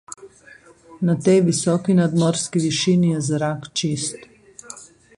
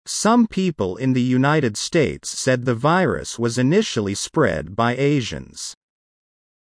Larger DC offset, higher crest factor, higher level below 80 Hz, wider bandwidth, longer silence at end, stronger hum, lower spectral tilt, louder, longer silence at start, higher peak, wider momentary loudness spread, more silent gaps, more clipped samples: neither; about the same, 16 dB vs 16 dB; second, -58 dBFS vs -48 dBFS; about the same, 11.5 kHz vs 10.5 kHz; second, 0.3 s vs 0.95 s; neither; about the same, -5.5 dB/octave vs -5 dB/octave; about the same, -20 LUFS vs -20 LUFS; about the same, 0.1 s vs 0.05 s; about the same, -4 dBFS vs -4 dBFS; first, 22 LU vs 6 LU; neither; neither